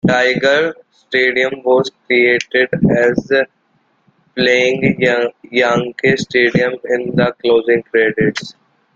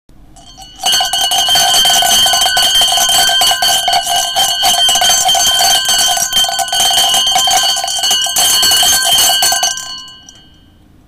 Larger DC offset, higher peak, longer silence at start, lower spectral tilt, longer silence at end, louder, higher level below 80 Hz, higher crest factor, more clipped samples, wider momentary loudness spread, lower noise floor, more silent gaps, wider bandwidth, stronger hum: neither; about the same, 0 dBFS vs -2 dBFS; second, 0.05 s vs 0.35 s; first, -5.5 dB/octave vs 1.5 dB/octave; second, 0.45 s vs 0.9 s; second, -14 LUFS vs -8 LUFS; second, -50 dBFS vs -42 dBFS; about the same, 14 dB vs 10 dB; neither; about the same, 6 LU vs 5 LU; first, -60 dBFS vs -44 dBFS; neither; second, 7.8 kHz vs 16.5 kHz; neither